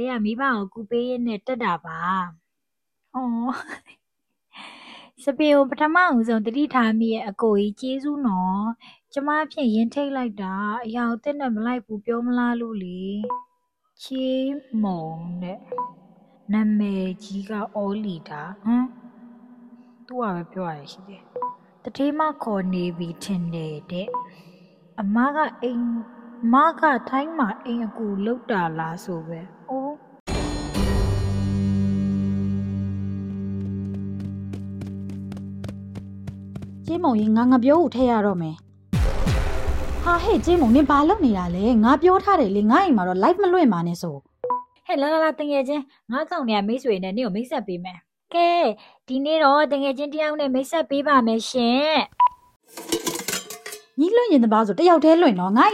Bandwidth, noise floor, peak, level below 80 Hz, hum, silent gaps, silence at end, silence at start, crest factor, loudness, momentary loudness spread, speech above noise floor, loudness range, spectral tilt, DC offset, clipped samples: 16 kHz; -83 dBFS; -4 dBFS; -38 dBFS; none; 30.20-30.26 s, 52.56-52.60 s; 0 s; 0 s; 18 dB; -22 LUFS; 16 LU; 62 dB; 10 LU; -6 dB/octave; under 0.1%; under 0.1%